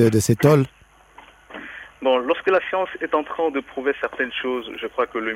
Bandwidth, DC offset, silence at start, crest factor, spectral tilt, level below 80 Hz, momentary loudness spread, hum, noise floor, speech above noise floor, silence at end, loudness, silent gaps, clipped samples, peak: 16 kHz; under 0.1%; 0 s; 20 dB; -6 dB/octave; -56 dBFS; 16 LU; none; -49 dBFS; 28 dB; 0 s; -22 LUFS; none; under 0.1%; -2 dBFS